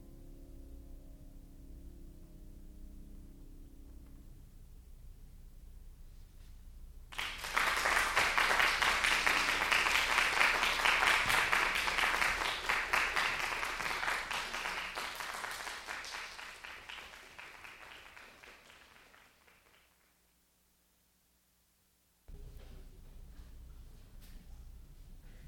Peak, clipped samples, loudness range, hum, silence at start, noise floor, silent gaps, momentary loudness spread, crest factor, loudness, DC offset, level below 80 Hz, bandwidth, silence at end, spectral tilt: -12 dBFS; under 0.1%; 21 LU; none; 0 s; -73 dBFS; none; 23 LU; 24 dB; -31 LUFS; under 0.1%; -54 dBFS; over 20 kHz; 0 s; -1 dB/octave